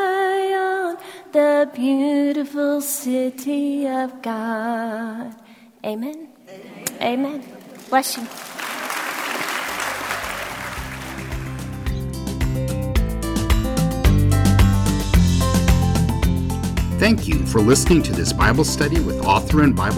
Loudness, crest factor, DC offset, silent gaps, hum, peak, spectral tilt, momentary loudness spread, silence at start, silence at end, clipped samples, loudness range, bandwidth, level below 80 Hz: -20 LUFS; 16 dB; under 0.1%; none; none; -4 dBFS; -5.5 dB/octave; 13 LU; 0 s; 0 s; under 0.1%; 8 LU; 16 kHz; -26 dBFS